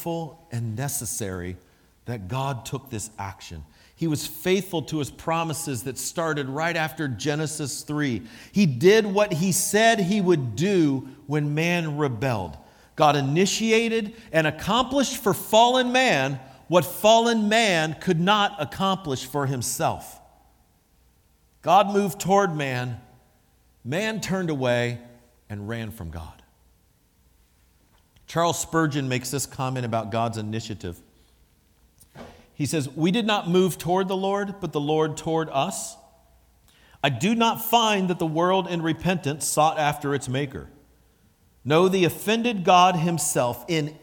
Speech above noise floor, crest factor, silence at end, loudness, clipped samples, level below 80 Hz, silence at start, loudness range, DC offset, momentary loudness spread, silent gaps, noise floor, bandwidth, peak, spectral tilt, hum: 39 dB; 22 dB; 0.05 s; -23 LUFS; under 0.1%; -56 dBFS; 0 s; 9 LU; under 0.1%; 14 LU; none; -62 dBFS; 19 kHz; -4 dBFS; -4.5 dB/octave; none